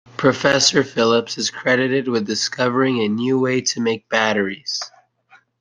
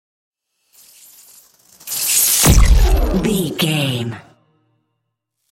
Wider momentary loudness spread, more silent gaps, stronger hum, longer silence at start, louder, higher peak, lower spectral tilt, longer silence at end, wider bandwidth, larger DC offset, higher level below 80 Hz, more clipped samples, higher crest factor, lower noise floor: second, 8 LU vs 15 LU; neither; neither; second, 0.2 s vs 1.85 s; second, -18 LUFS vs -15 LUFS; about the same, 0 dBFS vs 0 dBFS; about the same, -3.5 dB/octave vs -3.5 dB/octave; second, 0.75 s vs 1.3 s; second, 10.5 kHz vs 16.5 kHz; neither; second, -62 dBFS vs -20 dBFS; neither; about the same, 18 dB vs 16 dB; second, -54 dBFS vs -74 dBFS